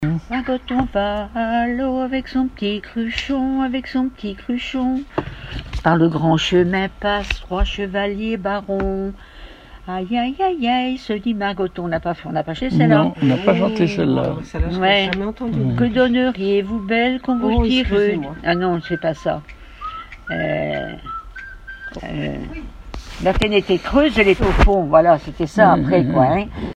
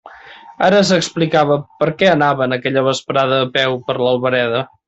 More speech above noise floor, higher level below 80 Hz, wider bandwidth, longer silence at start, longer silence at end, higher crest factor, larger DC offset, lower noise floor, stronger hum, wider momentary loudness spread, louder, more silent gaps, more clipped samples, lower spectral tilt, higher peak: second, 20 dB vs 24 dB; first, -30 dBFS vs -56 dBFS; first, 9.6 kHz vs 8.2 kHz; about the same, 0 s vs 0.05 s; second, 0 s vs 0.2 s; about the same, 18 dB vs 14 dB; neither; about the same, -39 dBFS vs -39 dBFS; neither; first, 14 LU vs 5 LU; second, -19 LUFS vs -15 LUFS; neither; neither; first, -7 dB/octave vs -5 dB/octave; about the same, 0 dBFS vs -2 dBFS